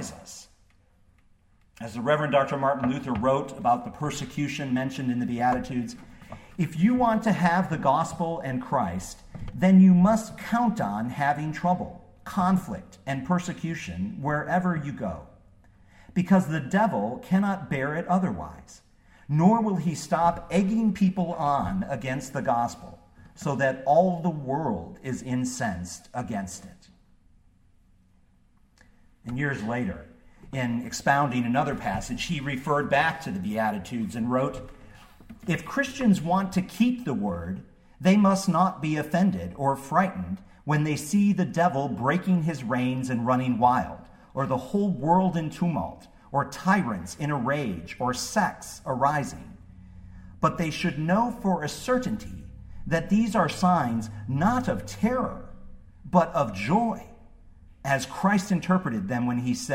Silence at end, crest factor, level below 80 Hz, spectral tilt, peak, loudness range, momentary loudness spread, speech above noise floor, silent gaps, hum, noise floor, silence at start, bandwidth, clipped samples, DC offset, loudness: 0 s; 20 dB; -52 dBFS; -6.5 dB/octave; -6 dBFS; 6 LU; 13 LU; 35 dB; none; none; -60 dBFS; 0 s; 15.5 kHz; under 0.1%; under 0.1%; -26 LUFS